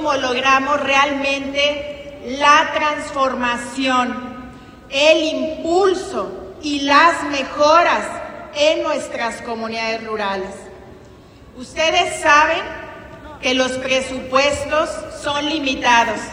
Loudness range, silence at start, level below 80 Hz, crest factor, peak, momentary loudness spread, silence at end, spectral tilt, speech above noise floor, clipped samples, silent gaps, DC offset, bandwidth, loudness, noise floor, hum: 5 LU; 0 s; -48 dBFS; 18 dB; 0 dBFS; 16 LU; 0 s; -2.5 dB/octave; 25 dB; under 0.1%; none; under 0.1%; 15.5 kHz; -17 LUFS; -42 dBFS; none